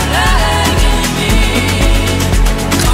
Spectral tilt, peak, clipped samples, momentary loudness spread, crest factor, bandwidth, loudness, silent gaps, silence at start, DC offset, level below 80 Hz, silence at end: -4 dB/octave; 0 dBFS; under 0.1%; 2 LU; 10 dB; 16.5 kHz; -12 LUFS; none; 0 s; under 0.1%; -14 dBFS; 0 s